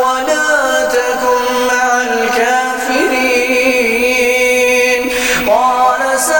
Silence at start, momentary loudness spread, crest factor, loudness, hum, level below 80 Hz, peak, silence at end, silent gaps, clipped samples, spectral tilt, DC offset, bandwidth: 0 s; 3 LU; 12 dB; -12 LUFS; none; -42 dBFS; 0 dBFS; 0 s; none; under 0.1%; -1.5 dB/octave; 0.4%; 17 kHz